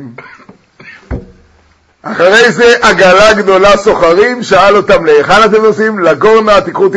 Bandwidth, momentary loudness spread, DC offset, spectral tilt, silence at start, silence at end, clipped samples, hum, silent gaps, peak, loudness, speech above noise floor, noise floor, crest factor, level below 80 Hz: 11 kHz; 14 LU; under 0.1%; -4 dB/octave; 0 s; 0 s; 2%; none; none; 0 dBFS; -6 LUFS; 42 dB; -48 dBFS; 8 dB; -34 dBFS